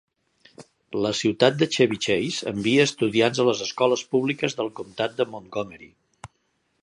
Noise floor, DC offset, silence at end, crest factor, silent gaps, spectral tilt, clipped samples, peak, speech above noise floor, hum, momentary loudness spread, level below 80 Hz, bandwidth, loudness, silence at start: -71 dBFS; under 0.1%; 0.95 s; 22 dB; none; -4.5 dB/octave; under 0.1%; -2 dBFS; 48 dB; none; 11 LU; -62 dBFS; 11 kHz; -23 LUFS; 0.6 s